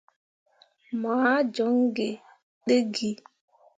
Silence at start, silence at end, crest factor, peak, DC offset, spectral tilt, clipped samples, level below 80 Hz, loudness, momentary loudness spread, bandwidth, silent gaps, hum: 0.9 s; 0.6 s; 18 dB; -8 dBFS; under 0.1%; -4.5 dB/octave; under 0.1%; -76 dBFS; -26 LUFS; 13 LU; 9.2 kHz; 2.43-2.61 s; none